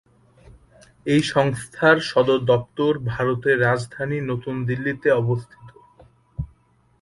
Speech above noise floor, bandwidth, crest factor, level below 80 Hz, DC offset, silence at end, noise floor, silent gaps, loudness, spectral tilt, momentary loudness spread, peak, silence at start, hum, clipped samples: 39 dB; 11.5 kHz; 20 dB; -50 dBFS; under 0.1%; 0.55 s; -60 dBFS; none; -21 LUFS; -6.5 dB/octave; 15 LU; -4 dBFS; 1.05 s; none; under 0.1%